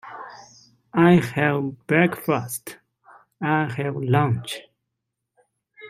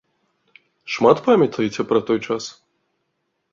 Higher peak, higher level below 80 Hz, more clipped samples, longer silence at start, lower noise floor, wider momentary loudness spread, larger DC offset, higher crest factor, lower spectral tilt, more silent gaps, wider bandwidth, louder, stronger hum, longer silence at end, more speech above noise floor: about the same, -2 dBFS vs -2 dBFS; about the same, -62 dBFS vs -62 dBFS; neither; second, 0.05 s vs 0.85 s; first, -81 dBFS vs -73 dBFS; first, 19 LU vs 12 LU; neither; about the same, 22 dB vs 20 dB; about the same, -6.5 dB/octave vs -5.5 dB/octave; neither; first, 16 kHz vs 7.6 kHz; second, -22 LUFS vs -19 LUFS; neither; second, 0 s vs 1 s; first, 60 dB vs 55 dB